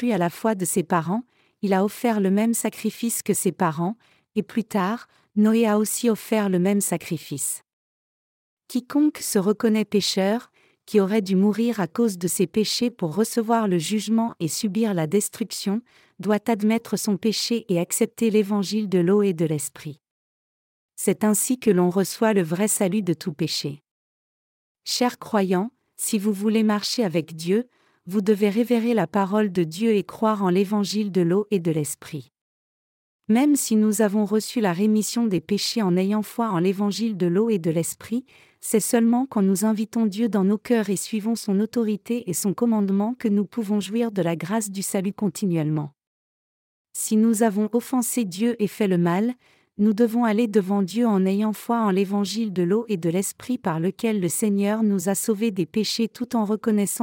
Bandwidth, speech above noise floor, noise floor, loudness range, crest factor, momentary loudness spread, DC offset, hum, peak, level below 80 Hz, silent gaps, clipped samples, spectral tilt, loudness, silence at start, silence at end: 17 kHz; over 68 dB; under -90 dBFS; 3 LU; 16 dB; 7 LU; under 0.1%; none; -6 dBFS; -72 dBFS; 7.73-8.57 s, 20.11-20.89 s, 23.91-24.75 s, 32.41-33.19 s, 46.07-46.85 s; under 0.1%; -5 dB/octave; -23 LUFS; 0 s; 0 s